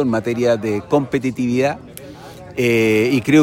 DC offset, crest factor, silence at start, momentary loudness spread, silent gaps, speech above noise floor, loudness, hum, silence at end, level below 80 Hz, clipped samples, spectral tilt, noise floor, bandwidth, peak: under 0.1%; 16 dB; 0 s; 21 LU; none; 20 dB; -18 LUFS; none; 0 s; -52 dBFS; under 0.1%; -6 dB/octave; -36 dBFS; 16.5 kHz; -2 dBFS